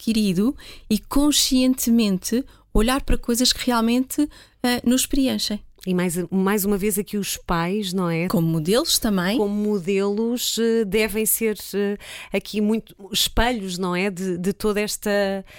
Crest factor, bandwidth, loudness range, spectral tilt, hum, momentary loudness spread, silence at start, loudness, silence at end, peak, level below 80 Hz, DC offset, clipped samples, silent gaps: 16 dB; 17 kHz; 3 LU; -4 dB/octave; none; 7 LU; 0 s; -22 LUFS; 0 s; -6 dBFS; -34 dBFS; under 0.1%; under 0.1%; none